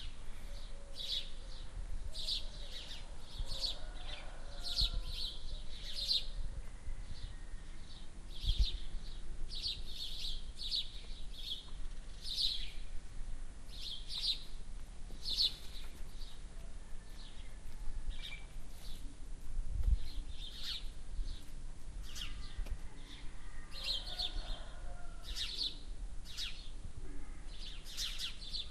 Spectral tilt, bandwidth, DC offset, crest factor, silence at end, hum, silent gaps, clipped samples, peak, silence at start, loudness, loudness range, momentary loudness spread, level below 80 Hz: -2.5 dB/octave; 13 kHz; under 0.1%; 20 dB; 0 s; none; none; under 0.1%; -20 dBFS; 0 s; -42 LUFS; 6 LU; 17 LU; -42 dBFS